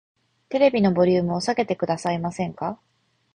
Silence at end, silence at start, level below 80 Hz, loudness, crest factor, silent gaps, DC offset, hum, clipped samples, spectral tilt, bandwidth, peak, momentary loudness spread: 0.6 s; 0.5 s; -58 dBFS; -23 LUFS; 18 dB; none; under 0.1%; none; under 0.1%; -6.5 dB/octave; 10.5 kHz; -6 dBFS; 12 LU